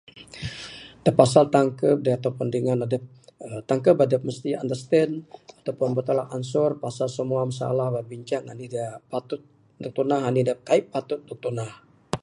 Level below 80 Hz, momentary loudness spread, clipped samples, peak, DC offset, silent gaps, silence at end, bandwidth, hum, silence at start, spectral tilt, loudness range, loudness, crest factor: -60 dBFS; 16 LU; under 0.1%; 0 dBFS; under 0.1%; none; 0.05 s; 11 kHz; none; 0.15 s; -6.5 dB/octave; 5 LU; -24 LUFS; 24 dB